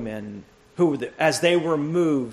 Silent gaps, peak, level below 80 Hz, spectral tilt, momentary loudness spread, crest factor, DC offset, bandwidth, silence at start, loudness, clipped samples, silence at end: none; -6 dBFS; -60 dBFS; -5 dB/octave; 19 LU; 18 dB; under 0.1%; 13.5 kHz; 0 s; -22 LUFS; under 0.1%; 0 s